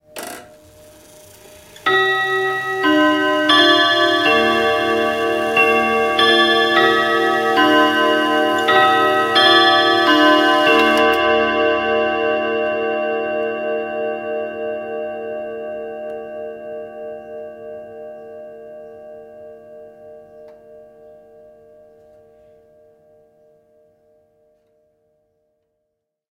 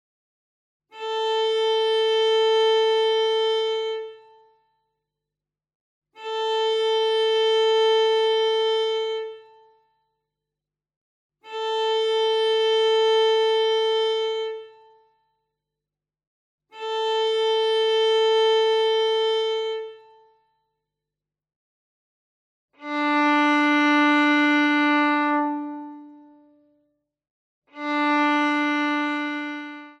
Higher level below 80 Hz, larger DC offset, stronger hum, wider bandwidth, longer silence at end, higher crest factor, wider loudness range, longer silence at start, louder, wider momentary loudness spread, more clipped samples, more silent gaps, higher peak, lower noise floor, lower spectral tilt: first, -56 dBFS vs under -90 dBFS; neither; second, none vs 50 Hz at -90 dBFS; first, 16 kHz vs 9.8 kHz; first, 5.5 s vs 0.1 s; about the same, 18 dB vs 14 dB; first, 19 LU vs 9 LU; second, 0.15 s vs 0.95 s; first, -15 LUFS vs -21 LUFS; first, 21 LU vs 13 LU; neither; second, none vs 5.75-6.02 s, 10.96-11.30 s, 16.27-16.58 s, 21.56-22.69 s, 27.30-27.62 s; first, 0 dBFS vs -10 dBFS; second, -76 dBFS vs -89 dBFS; first, -3 dB/octave vs -1.5 dB/octave